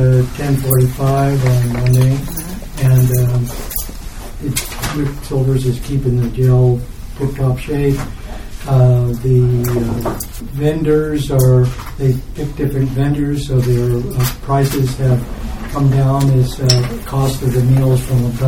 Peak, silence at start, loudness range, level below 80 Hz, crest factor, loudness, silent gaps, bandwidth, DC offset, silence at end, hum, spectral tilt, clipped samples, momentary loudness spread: 0 dBFS; 0 s; 3 LU; -28 dBFS; 14 dB; -15 LUFS; none; 17.5 kHz; under 0.1%; 0 s; none; -6.5 dB/octave; under 0.1%; 10 LU